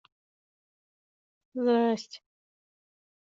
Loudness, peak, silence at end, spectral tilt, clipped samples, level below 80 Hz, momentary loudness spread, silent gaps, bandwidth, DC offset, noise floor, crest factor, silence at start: -27 LUFS; -14 dBFS; 1.2 s; -4 dB/octave; under 0.1%; -84 dBFS; 20 LU; none; 7.6 kHz; under 0.1%; under -90 dBFS; 18 dB; 1.55 s